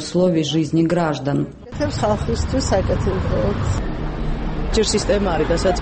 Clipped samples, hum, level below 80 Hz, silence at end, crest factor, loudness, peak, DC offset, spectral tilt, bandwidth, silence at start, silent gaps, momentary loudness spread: under 0.1%; none; -28 dBFS; 0 s; 14 dB; -20 LUFS; -6 dBFS; under 0.1%; -5.5 dB/octave; 8.8 kHz; 0 s; none; 8 LU